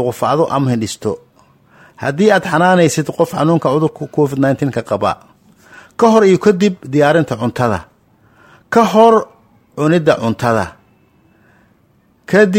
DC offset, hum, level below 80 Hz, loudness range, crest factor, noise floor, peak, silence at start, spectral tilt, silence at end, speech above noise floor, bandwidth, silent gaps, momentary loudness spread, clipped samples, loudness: under 0.1%; none; -52 dBFS; 2 LU; 14 dB; -54 dBFS; 0 dBFS; 0 s; -6 dB/octave; 0 s; 41 dB; 16.5 kHz; none; 12 LU; under 0.1%; -14 LUFS